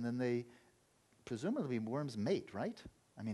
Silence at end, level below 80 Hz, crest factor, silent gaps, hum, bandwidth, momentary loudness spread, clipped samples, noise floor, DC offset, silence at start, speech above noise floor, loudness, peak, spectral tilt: 0 s; -74 dBFS; 16 dB; none; none; 12 kHz; 18 LU; under 0.1%; -72 dBFS; under 0.1%; 0 s; 33 dB; -40 LUFS; -24 dBFS; -7 dB/octave